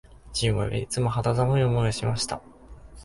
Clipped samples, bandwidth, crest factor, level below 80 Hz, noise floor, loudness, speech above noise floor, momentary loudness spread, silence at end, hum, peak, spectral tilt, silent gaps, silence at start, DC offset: under 0.1%; 11.5 kHz; 14 dB; -44 dBFS; -46 dBFS; -25 LUFS; 21 dB; 8 LU; 0 s; none; -12 dBFS; -5.5 dB/octave; none; 0.25 s; under 0.1%